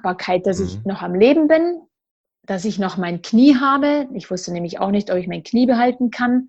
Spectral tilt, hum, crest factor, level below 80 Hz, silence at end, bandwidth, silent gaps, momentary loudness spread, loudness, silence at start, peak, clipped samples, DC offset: -6 dB/octave; none; 16 dB; -56 dBFS; 0 s; 8.2 kHz; 2.11-2.24 s; 13 LU; -18 LUFS; 0.05 s; -2 dBFS; under 0.1%; under 0.1%